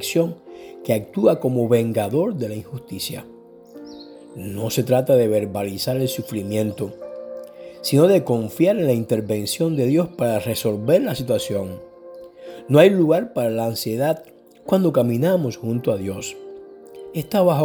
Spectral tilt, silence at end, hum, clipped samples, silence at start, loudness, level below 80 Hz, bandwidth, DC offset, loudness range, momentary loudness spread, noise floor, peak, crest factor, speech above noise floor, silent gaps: -6 dB/octave; 0 s; none; under 0.1%; 0 s; -20 LUFS; -60 dBFS; over 20 kHz; under 0.1%; 4 LU; 22 LU; -42 dBFS; -2 dBFS; 20 dB; 23 dB; none